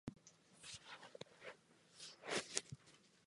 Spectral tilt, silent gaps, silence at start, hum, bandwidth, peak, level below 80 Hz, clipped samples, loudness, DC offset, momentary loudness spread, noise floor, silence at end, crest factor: -2 dB/octave; none; 0.05 s; none; 11.5 kHz; -14 dBFS; -78 dBFS; under 0.1%; -50 LUFS; under 0.1%; 23 LU; -70 dBFS; 0 s; 40 dB